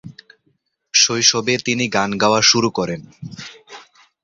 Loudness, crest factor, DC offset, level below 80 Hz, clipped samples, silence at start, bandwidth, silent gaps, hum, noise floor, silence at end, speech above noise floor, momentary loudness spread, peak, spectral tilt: -15 LUFS; 20 dB; under 0.1%; -56 dBFS; under 0.1%; 0.05 s; 7.8 kHz; none; none; -66 dBFS; 0.45 s; 48 dB; 21 LU; 0 dBFS; -2 dB/octave